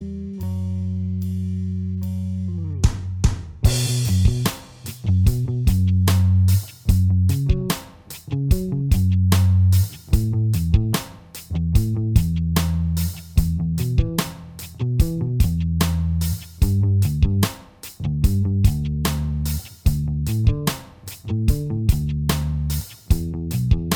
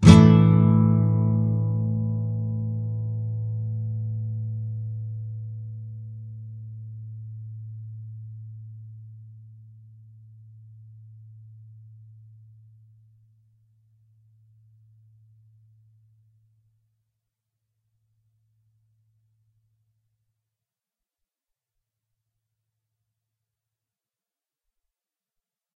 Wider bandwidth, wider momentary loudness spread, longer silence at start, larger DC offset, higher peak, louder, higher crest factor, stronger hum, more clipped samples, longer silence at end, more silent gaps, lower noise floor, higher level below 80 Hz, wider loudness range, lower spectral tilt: first, over 20 kHz vs 8.2 kHz; second, 10 LU vs 23 LU; about the same, 0 s vs 0 s; neither; about the same, -2 dBFS vs 0 dBFS; about the same, -21 LUFS vs -23 LUFS; second, 18 dB vs 26 dB; neither; neither; second, 0 s vs 16.35 s; neither; second, -39 dBFS vs under -90 dBFS; first, -26 dBFS vs -48 dBFS; second, 4 LU vs 26 LU; second, -6 dB/octave vs -8 dB/octave